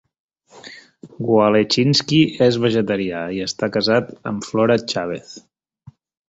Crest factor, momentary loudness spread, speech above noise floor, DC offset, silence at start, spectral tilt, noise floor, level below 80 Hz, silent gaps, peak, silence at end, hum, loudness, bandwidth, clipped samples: 18 dB; 13 LU; 30 dB; under 0.1%; 0.55 s; -5.5 dB/octave; -48 dBFS; -56 dBFS; none; -2 dBFS; 0.9 s; none; -18 LUFS; 8 kHz; under 0.1%